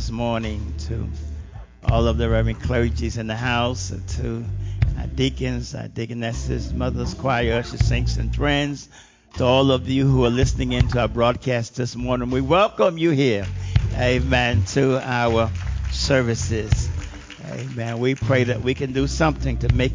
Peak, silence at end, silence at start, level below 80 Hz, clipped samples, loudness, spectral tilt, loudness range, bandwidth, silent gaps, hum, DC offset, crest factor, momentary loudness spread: -2 dBFS; 0 s; 0 s; -28 dBFS; under 0.1%; -22 LUFS; -6 dB/octave; 4 LU; 7.6 kHz; none; none; under 0.1%; 18 dB; 10 LU